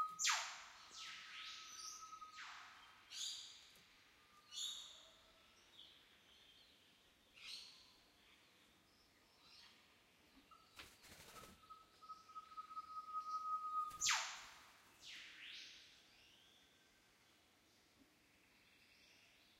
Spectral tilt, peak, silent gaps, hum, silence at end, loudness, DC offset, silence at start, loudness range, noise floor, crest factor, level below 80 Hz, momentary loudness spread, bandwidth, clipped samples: 2 dB/octave; -24 dBFS; none; none; 0 s; -47 LUFS; under 0.1%; 0 s; 19 LU; -74 dBFS; 28 dB; -84 dBFS; 25 LU; 16 kHz; under 0.1%